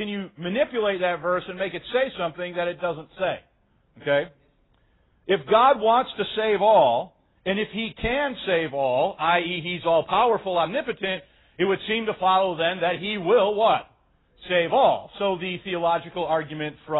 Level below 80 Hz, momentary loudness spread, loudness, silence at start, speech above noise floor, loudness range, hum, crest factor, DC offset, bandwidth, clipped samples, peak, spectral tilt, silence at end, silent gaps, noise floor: -54 dBFS; 11 LU; -23 LUFS; 0 s; 40 dB; 6 LU; none; 18 dB; under 0.1%; 4.1 kHz; under 0.1%; -6 dBFS; -9.5 dB/octave; 0 s; none; -63 dBFS